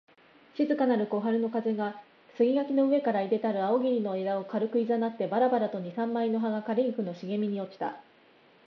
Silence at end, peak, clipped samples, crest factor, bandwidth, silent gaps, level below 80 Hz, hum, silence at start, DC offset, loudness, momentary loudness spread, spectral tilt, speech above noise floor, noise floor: 0.65 s; -14 dBFS; under 0.1%; 14 dB; 6 kHz; none; -84 dBFS; none; 0.55 s; under 0.1%; -29 LUFS; 9 LU; -9 dB/octave; 32 dB; -60 dBFS